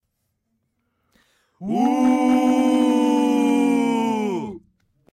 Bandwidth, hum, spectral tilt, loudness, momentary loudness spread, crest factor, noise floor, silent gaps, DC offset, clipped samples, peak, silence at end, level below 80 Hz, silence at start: 13 kHz; none; -5.5 dB/octave; -19 LUFS; 9 LU; 12 dB; -74 dBFS; none; under 0.1%; under 0.1%; -10 dBFS; 0.55 s; -64 dBFS; 1.6 s